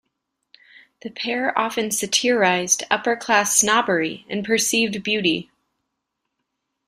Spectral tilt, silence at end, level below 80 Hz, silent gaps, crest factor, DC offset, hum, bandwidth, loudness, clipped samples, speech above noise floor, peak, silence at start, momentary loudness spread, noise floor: -2 dB/octave; 1.45 s; -64 dBFS; none; 20 dB; under 0.1%; none; 15.5 kHz; -20 LUFS; under 0.1%; 58 dB; -2 dBFS; 1.05 s; 10 LU; -79 dBFS